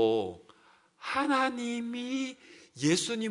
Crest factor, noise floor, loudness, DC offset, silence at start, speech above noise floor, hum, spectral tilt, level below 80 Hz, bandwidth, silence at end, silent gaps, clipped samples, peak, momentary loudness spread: 18 dB; -63 dBFS; -31 LUFS; under 0.1%; 0 s; 32 dB; none; -4 dB/octave; -74 dBFS; 11 kHz; 0 s; none; under 0.1%; -12 dBFS; 18 LU